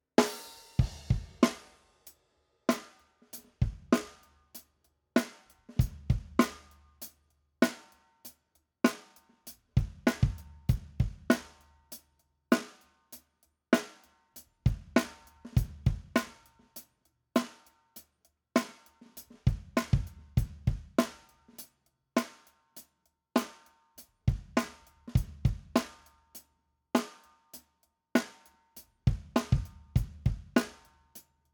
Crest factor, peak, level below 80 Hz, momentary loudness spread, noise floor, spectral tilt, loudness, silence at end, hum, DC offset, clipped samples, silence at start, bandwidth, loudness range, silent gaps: 26 dB; -8 dBFS; -42 dBFS; 22 LU; -76 dBFS; -6 dB/octave; -32 LUFS; 0.35 s; none; under 0.1%; under 0.1%; 0.2 s; over 20 kHz; 3 LU; none